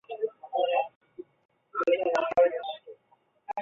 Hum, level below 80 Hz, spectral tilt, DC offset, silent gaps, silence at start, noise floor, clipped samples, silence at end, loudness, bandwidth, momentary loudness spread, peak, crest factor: none; -72 dBFS; -4 dB/octave; under 0.1%; 0.96-1.01 s, 1.45-1.49 s; 0.1 s; -67 dBFS; under 0.1%; 0 s; -28 LUFS; 7.2 kHz; 21 LU; -12 dBFS; 18 dB